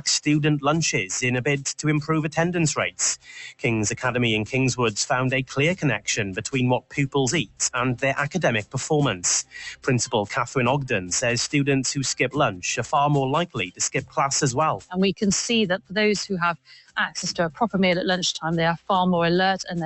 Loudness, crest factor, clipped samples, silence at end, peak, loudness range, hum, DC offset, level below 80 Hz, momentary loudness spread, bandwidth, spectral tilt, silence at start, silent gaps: -23 LUFS; 16 dB; under 0.1%; 0 s; -8 dBFS; 1 LU; none; under 0.1%; -54 dBFS; 4 LU; 8.4 kHz; -4 dB/octave; 0.05 s; none